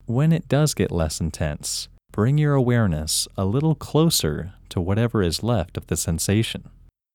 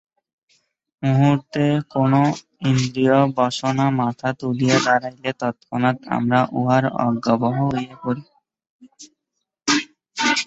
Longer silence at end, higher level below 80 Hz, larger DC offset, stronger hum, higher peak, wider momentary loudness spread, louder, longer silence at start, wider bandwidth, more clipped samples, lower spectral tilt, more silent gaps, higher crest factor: first, 0.5 s vs 0 s; first, -40 dBFS vs -56 dBFS; neither; neither; second, -6 dBFS vs -2 dBFS; about the same, 9 LU vs 9 LU; about the same, -22 LUFS vs -20 LUFS; second, 0.1 s vs 1 s; first, 17.5 kHz vs 8.2 kHz; neither; about the same, -5 dB/octave vs -5.5 dB/octave; second, none vs 8.70-8.79 s; about the same, 16 dB vs 18 dB